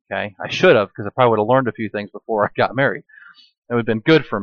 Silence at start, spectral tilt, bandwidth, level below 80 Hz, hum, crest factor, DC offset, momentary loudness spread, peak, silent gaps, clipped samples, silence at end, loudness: 0.1 s; -6.5 dB/octave; 7 kHz; -56 dBFS; none; 16 dB; under 0.1%; 12 LU; -2 dBFS; 3.58-3.62 s; under 0.1%; 0 s; -18 LUFS